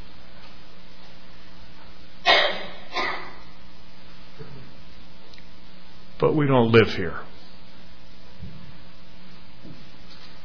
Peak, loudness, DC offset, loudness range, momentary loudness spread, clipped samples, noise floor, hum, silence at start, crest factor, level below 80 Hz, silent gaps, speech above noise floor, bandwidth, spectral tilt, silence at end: -4 dBFS; -21 LUFS; 4%; 13 LU; 29 LU; under 0.1%; -48 dBFS; none; 0.45 s; 24 dB; -50 dBFS; none; 29 dB; 5.4 kHz; -6 dB/octave; 0.2 s